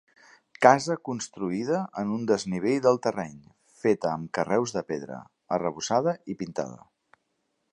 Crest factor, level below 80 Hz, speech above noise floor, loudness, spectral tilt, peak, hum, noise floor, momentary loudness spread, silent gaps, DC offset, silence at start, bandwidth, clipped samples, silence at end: 26 dB; -66 dBFS; 50 dB; -27 LUFS; -5 dB/octave; -2 dBFS; none; -76 dBFS; 13 LU; none; under 0.1%; 0.6 s; 10.5 kHz; under 0.1%; 1 s